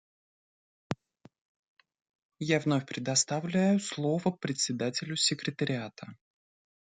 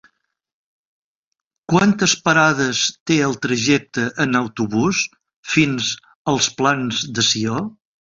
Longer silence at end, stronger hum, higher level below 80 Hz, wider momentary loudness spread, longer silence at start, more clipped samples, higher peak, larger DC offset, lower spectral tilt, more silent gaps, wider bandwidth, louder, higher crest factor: first, 0.7 s vs 0.35 s; neither; second, -72 dBFS vs -54 dBFS; first, 13 LU vs 9 LU; second, 0.9 s vs 1.7 s; neither; second, -12 dBFS vs -2 dBFS; neither; about the same, -4 dB/octave vs -3.5 dB/octave; first, 1.41-1.77 s, 2.15-2.30 s vs 3.00-3.06 s, 5.36-5.43 s, 6.15-6.25 s; first, 9.6 kHz vs 8 kHz; second, -30 LUFS vs -18 LUFS; about the same, 20 dB vs 18 dB